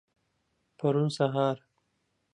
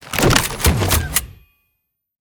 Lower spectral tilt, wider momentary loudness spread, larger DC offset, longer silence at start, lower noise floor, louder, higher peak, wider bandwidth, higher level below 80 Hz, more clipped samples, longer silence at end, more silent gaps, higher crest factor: first, -7 dB/octave vs -3.5 dB/octave; about the same, 5 LU vs 6 LU; neither; first, 0.8 s vs 0 s; about the same, -77 dBFS vs -74 dBFS; second, -29 LUFS vs -16 LUFS; second, -12 dBFS vs 0 dBFS; second, 11 kHz vs over 20 kHz; second, -78 dBFS vs -28 dBFS; neither; second, 0.75 s vs 0.9 s; neither; about the same, 20 dB vs 20 dB